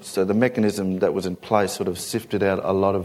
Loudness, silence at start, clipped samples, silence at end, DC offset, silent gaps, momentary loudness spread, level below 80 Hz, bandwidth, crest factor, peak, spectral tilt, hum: -23 LUFS; 0 s; under 0.1%; 0 s; under 0.1%; none; 6 LU; -58 dBFS; 16 kHz; 20 dB; -2 dBFS; -5.5 dB/octave; none